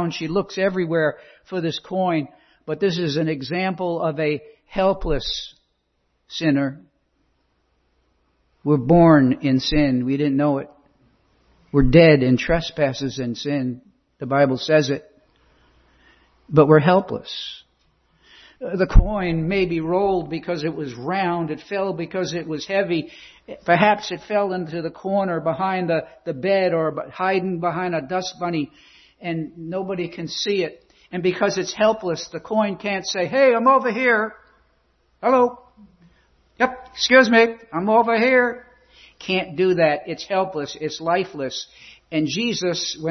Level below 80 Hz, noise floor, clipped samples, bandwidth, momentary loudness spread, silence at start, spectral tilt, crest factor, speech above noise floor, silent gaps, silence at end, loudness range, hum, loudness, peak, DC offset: -34 dBFS; -69 dBFS; under 0.1%; 6.4 kHz; 13 LU; 0 s; -6 dB/octave; 20 dB; 49 dB; none; 0 s; 6 LU; none; -21 LUFS; 0 dBFS; under 0.1%